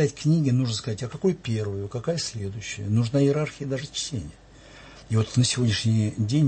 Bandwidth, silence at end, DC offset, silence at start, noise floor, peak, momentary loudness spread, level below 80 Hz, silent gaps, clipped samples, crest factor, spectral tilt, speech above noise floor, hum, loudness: 8.8 kHz; 0 s; under 0.1%; 0 s; -47 dBFS; -8 dBFS; 11 LU; -52 dBFS; none; under 0.1%; 16 dB; -5.5 dB/octave; 23 dB; none; -25 LUFS